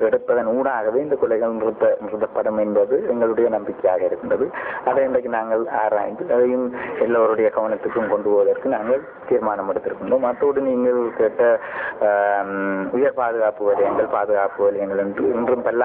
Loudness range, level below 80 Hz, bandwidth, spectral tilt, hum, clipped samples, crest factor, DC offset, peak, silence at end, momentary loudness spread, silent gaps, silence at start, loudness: 1 LU; -58 dBFS; 3.7 kHz; -10.5 dB/octave; none; under 0.1%; 14 dB; under 0.1%; -6 dBFS; 0 s; 5 LU; none; 0 s; -20 LUFS